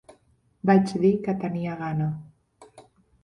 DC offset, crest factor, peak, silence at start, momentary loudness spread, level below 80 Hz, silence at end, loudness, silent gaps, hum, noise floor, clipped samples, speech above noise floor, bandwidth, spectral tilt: under 0.1%; 20 dB; -6 dBFS; 0.65 s; 10 LU; -60 dBFS; 0.45 s; -24 LUFS; none; none; -63 dBFS; under 0.1%; 40 dB; 11 kHz; -8.5 dB/octave